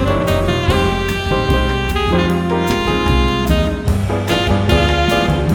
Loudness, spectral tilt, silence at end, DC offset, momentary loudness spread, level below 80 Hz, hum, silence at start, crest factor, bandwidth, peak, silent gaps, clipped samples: -16 LUFS; -6 dB/octave; 0 s; under 0.1%; 4 LU; -22 dBFS; none; 0 s; 14 dB; 19.5 kHz; 0 dBFS; none; under 0.1%